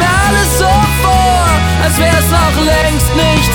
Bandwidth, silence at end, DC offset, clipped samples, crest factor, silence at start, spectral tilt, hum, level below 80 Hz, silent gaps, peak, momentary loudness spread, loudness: over 20 kHz; 0 s; under 0.1%; under 0.1%; 10 dB; 0 s; -4.5 dB/octave; none; -16 dBFS; none; 0 dBFS; 1 LU; -10 LUFS